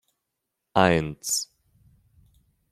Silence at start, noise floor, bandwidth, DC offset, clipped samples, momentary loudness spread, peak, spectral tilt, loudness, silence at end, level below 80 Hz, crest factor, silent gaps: 0.75 s; -82 dBFS; 16 kHz; under 0.1%; under 0.1%; 7 LU; -2 dBFS; -4 dB/octave; -24 LUFS; 1.3 s; -56 dBFS; 26 dB; none